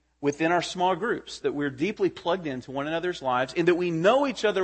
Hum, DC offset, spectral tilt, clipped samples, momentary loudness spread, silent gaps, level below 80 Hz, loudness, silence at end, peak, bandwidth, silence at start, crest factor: none; under 0.1%; -5 dB/octave; under 0.1%; 8 LU; none; -62 dBFS; -26 LUFS; 0 s; -8 dBFS; 8.8 kHz; 0.2 s; 18 dB